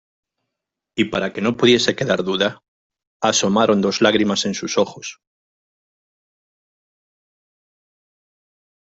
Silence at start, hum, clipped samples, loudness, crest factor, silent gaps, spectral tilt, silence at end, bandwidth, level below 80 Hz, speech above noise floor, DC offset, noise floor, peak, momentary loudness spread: 0.95 s; none; under 0.1%; -18 LUFS; 20 dB; 2.68-2.90 s, 3.07-3.20 s; -4 dB/octave; 3.75 s; 8 kHz; -58 dBFS; 64 dB; under 0.1%; -82 dBFS; -2 dBFS; 8 LU